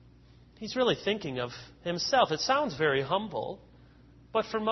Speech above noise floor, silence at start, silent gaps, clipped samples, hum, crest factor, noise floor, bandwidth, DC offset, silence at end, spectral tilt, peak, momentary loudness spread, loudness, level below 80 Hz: 27 dB; 0.6 s; none; under 0.1%; none; 22 dB; -56 dBFS; 6.2 kHz; under 0.1%; 0 s; -4 dB/octave; -10 dBFS; 13 LU; -30 LUFS; -60 dBFS